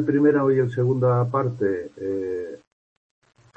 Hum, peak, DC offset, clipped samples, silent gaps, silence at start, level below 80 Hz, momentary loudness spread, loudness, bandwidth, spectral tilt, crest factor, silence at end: none; -8 dBFS; under 0.1%; under 0.1%; none; 0 s; -64 dBFS; 11 LU; -22 LUFS; 7.6 kHz; -10 dB/octave; 16 dB; 1 s